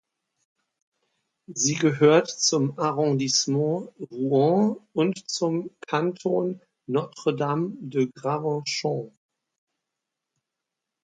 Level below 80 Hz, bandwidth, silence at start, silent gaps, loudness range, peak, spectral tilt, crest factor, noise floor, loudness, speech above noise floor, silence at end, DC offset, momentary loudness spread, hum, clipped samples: -74 dBFS; 9.6 kHz; 1.5 s; none; 6 LU; -4 dBFS; -4.5 dB/octave; 20 dB; -85 dBFS; -24 LUFS; 61 dB; 1.95 s; under 0.1%; 11 LU; none; under 0.1%